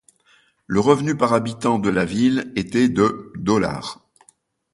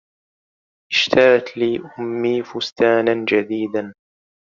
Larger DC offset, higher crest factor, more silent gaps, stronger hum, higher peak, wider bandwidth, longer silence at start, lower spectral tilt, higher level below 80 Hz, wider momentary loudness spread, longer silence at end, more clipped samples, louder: neither; about the same, 20 dB vs 18 dB; second, none vs 2.72-2.76 s; neither; about the same, -2 dBFS vs -2 dBFS; first, 11.5 kHz vs 7.4 kHz; second, 0.7 s vs 0.9 s; first, -6 dB/octave vs -2.5 dB/octave; first, -50 dBFS vs -62 dBFS; second, 7 LU vs 13 LU; first, 0.8 s vs 0.6 s; neither; about the same, -20 LUFS vs -18 LUFS